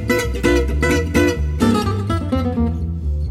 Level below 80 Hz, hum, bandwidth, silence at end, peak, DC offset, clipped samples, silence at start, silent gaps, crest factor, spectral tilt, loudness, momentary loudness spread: -24 dBFS; none; 15.5 kHz; 0 s; -2 dBFS; under 0.1%; under 0.1%; 0 s; none; 14 dB; -6 dB/octave; -18 LUFS; 5 LU